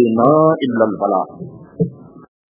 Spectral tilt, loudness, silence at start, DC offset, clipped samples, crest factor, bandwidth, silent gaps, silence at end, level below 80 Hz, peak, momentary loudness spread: -11.5 dB/octave; -16 LUFS; 0 s; under 0.1%; under 0.1%; 16 dB; 3.5 kHz; none; 0.35 s; -56 dBFS; 0 dBFS; 17 LU